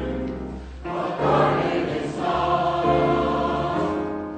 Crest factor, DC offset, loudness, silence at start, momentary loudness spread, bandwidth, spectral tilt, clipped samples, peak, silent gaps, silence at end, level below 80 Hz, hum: 14 dB; under 0.1%; -23 LUFS; 0 s; 11 LU; 9 kHz; -7 dB/octave; under 0.1%; -8 dBFS; none; 0 s; -40 dBFS; none